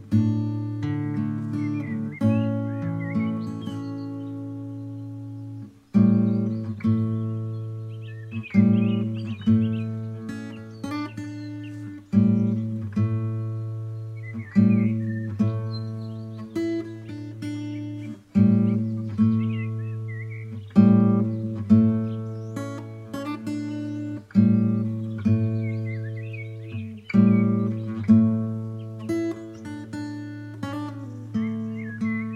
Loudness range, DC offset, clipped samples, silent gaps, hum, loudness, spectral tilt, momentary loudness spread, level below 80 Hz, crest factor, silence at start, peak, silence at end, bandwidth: 6 LU; under 0.1%; under 0.1%; none; none; -25 LUFS; -9.5 dB/octave; 16 LU; -62 dBFS; 20 dB; 0 s; -6 dBFS; 0 s; 7.4 kHz